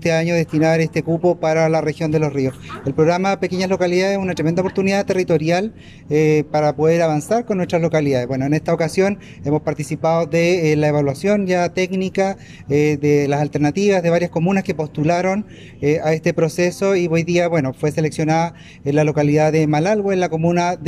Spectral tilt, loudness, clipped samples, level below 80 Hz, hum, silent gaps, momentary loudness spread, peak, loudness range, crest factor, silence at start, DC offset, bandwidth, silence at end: -6.5 dB/octave; -18 LUFS; under 0.1%; -52 dBFS; none; none; 5 LU; -4 dBFS; 1 LU; 14 dB; 0 s; under 0.1%; 12.5 kHz; 0 s